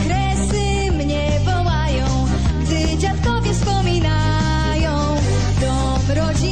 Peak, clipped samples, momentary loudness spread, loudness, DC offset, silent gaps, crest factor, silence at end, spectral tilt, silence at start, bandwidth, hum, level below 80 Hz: -8 dBFS; under 0.1%; 1 LU; -19 LUFS; 2%; none; 10 dB; 0 s; -5.5 dB/octave; 0 s; 9.8 kHz; none; -22 dBFS